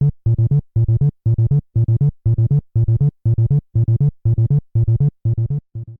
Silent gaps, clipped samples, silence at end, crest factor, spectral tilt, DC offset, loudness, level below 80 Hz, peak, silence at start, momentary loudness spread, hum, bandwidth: none; under 0.1%; 0.05 s; 8 dB; -13.5 dB/octave; under 0.1%; -18 LUFS; -32 dBFS; -8 dBFS; 0 s; 2 LU; none; 1.3 kHz